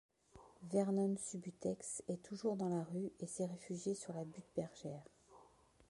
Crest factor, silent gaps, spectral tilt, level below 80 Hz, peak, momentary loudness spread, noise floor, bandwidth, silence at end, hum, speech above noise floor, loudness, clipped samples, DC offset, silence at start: 20 dB; none; -6.5 dB/octave; -78 dBFS; -24 dBFS; 11 LU; -68 dBFS; 11.5 kHz; 0.45 s; none; 26 dB; -43 LUFS; under 0.1%; under 0.1%; 0.35 s